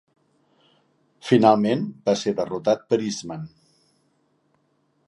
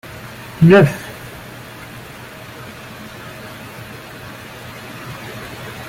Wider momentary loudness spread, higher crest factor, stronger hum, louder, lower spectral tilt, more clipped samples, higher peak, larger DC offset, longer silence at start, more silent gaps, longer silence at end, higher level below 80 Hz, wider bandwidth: second, 19 LU vs 23 LU; about the same, 22 dB vs 20 dB; neither; second, -22 LUFS vs -15 LUFS; about the same, -6 dB/octave vs -7 dB/octave; neither; about the same, -2 dBFS vs -2 dBFS; neither; first, 1.25 s vs 0.05 s; neither; first, 1.6 s vs 0 s; second, -66 dBFS vs -50 dBFS; second, 11.5 kHz vs 16.5 kHz